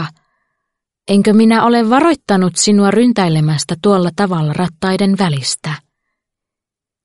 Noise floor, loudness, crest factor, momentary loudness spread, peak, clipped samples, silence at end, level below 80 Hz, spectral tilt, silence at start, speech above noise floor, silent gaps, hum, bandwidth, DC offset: -85 dBFS; -13 LUFS; 14 dB; 9 LU; 0 dBFS; under 0.1%; 1.25 s; -52 dBFS; -5.5 dB/octave; 0 s; 73 dB; none; none; 11.5 kHz; under 0.1%